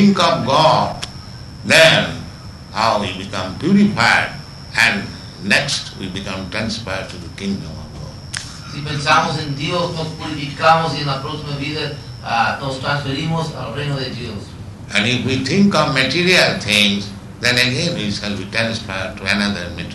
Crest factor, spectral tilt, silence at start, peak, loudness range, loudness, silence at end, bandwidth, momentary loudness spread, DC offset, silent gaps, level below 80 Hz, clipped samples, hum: 18 dB; -4.5 dB/octave; 0 s; 0 dBFS; 7 LU; -17 LUFS; 0 s; 12 kHz; 16 LU; under 0.1%; none; -42 dBFS; under 0.1%; none